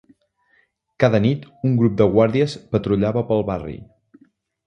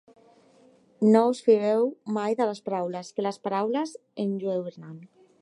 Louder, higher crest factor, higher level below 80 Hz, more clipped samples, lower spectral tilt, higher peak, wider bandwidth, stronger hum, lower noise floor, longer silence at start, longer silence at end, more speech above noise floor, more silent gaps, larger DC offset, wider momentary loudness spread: first, -19 LUFS vs -26 LUFS; about the same, 20 dB vs 20 dB; first, -46 dBFS vs -82 dBFS; neither; first, -8.5 dB/octave vs -7 dB/octave; first, 0 dBFS vs -8 dBFS; second, 9.6 kHz vs 11 kHz; neither; first, -63 dBFS vs -58 dBFS; about the same, 1 s vs 1 s; first, 0.85 s vs 0.35 s; first, 44 dB vs 33 dB; neither; neither; second, 10 LU vs 14 LU